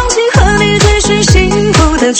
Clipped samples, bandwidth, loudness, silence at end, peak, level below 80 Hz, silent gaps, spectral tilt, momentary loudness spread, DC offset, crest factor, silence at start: 1%; 11 kHz; -8 LUFS; 0 s; 0 dBFS; -16 dBFS; none; -4.5 dB/octave; 1 LU; under 0.1%; 8 dB; 0 s